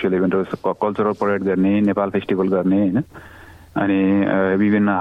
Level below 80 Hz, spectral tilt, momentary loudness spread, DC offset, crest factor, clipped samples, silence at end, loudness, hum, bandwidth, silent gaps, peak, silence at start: -54 dBFS; -9.5 dB/octave; 6 LU; under 0.1%; 12 dB; under 0.1%; 0 s; -19 LUFS; none; 5.2 kHz; none; -6 dBFS; 0 s